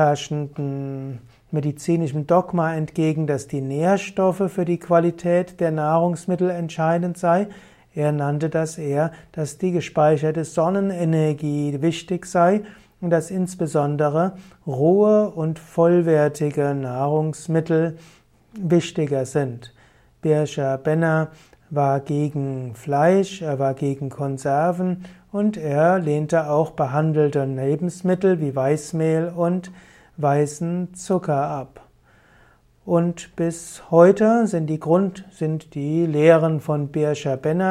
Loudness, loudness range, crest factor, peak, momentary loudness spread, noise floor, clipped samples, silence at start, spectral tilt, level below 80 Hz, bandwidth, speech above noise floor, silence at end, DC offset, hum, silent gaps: -21 LUFS; 4 LU; 20 dB; -2 dBFS; 10 LU; -55 dBFS; under 0.1%; 0 s; -7.5 dB/octave; -60 dBFS; 13 kHz; 34 dB; 0 s; under 0.1%; none; none